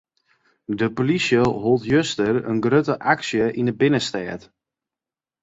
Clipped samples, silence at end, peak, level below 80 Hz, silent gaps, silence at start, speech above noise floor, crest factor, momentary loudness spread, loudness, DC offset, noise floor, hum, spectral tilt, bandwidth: under 0.1%; 1.05 s; -2 dBFS; -54 dBFS; none; 0.7 s; over 70 dB; 20 dB; 11 LU; -21 LUFS; under 0.1%; under -90 dBFS; none; -5.5 dB/octave; 8 kHz